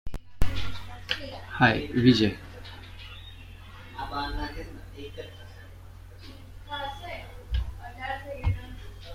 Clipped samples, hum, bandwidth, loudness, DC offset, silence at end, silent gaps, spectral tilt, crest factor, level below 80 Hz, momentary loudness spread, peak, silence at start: under 0.1%; none; 16.5 kHz; -29 LUFS; under 0.1%; 0 s; none; -6 dB/octave; 22 dB; -40 dBFS; 24 LU; -6 dBFS; 0.05 s